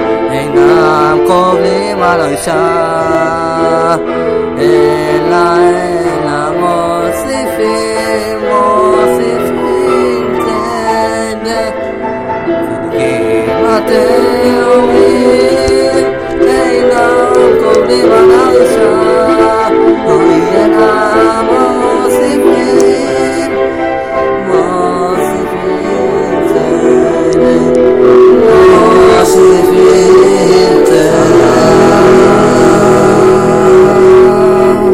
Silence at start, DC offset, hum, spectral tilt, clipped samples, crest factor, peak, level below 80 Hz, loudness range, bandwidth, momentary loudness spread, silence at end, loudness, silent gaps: 0 s; 0.7%; none; -5.5 dB/octave; 2%; 8 dB; 0 dBFS; -36 dBFS; 6 LU; 15 kHz; 8 LU; 0 s; -8 LUFS; none